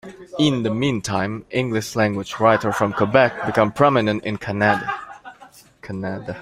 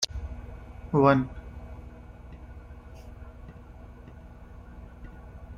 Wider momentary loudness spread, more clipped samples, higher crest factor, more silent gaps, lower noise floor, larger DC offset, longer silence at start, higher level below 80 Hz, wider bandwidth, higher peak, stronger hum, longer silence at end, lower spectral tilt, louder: second, 12 LU vs 26 LU; neither; second, 18 dB vs 24 dB; neither; about the same, -47 dBFS vs -46 dBFS; neither; about the same, 0.05 s vs 0 s; second, -54 dBFS vs -44 dBFS; first, 16 kHz vs 12.5 kHz; first, -2 dBFS vs -8 dBFS; second, none vs 60 Hz at -50 dBFS; about the same, 0 s vs 0 s; about the same, -5.5 dB/octave vs -5.5 dB/octave; first, -20 LUFS vs -25 LUFS